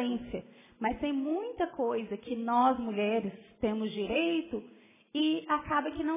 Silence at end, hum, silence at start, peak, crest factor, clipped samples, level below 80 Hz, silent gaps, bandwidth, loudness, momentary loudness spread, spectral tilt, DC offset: 0 s; none; 0 s; -16 dBFS; 16 dB; under 0.1%; -60 dBFS; none; 3.8 kHz; -32 LUFS; 11 LU; -3.5 dB/octave; under 0.1%